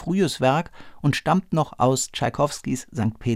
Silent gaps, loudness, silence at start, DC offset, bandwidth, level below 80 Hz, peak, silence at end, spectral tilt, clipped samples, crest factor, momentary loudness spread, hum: none; -23 LUFS; 0 s; under 0.1%; 16 kHz; -50 dBFS; -6 dBFS; 0 s; -5.5 dB/octave; under 0.1%; 16 dB; 7 LU; none